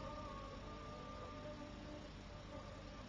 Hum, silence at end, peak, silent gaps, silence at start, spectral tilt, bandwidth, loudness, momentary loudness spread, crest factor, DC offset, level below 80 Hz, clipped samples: 50 Hz at -60 dBFS; 0 s; -38 dBFS; none; 0 s; -5.5 dB/octave; 9.4 kHz; -52 LUFS; 3 LU; 14 dB; under 0.1%; -58 dBFS; under 0.1%